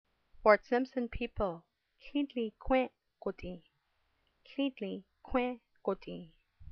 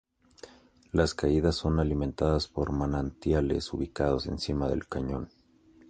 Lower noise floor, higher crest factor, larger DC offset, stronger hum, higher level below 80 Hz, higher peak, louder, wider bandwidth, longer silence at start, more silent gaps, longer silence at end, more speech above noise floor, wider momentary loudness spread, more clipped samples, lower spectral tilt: first, -78 dBFS vs -59 dBFS; first, 26 dB vs 20 dB; neither; neither; second, -52 dBFS vs -40 dBFS; about the same, -10 dBFS vs -10 dBFS; second, -35 LUFS vs -29 LUFS; second, 6.2 kHz vs 9.6 kHz; about the same, 0.35 s vs 0.45 s; neither; second, 0 s vs 0.65 s; first, 44 dB vs 31 dB; first, 18 LU vs 7 LU; neither; second, -4 dB/octave vs -6.5 dB/octave